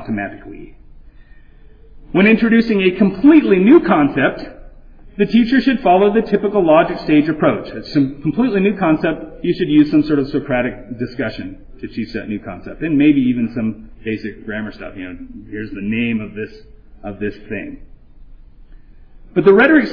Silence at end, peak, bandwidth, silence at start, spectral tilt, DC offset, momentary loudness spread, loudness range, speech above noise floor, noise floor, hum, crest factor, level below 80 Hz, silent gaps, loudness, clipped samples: 0 s; 0 dBFS; 5.2 kHz; 0 s; -9 dB/octave; under 0.1%; 20 LU; 12 LU; 26 dB; -41 dBFS; none; 16 dB; -40 dBFS; none; -15 LUFS; under 0.1%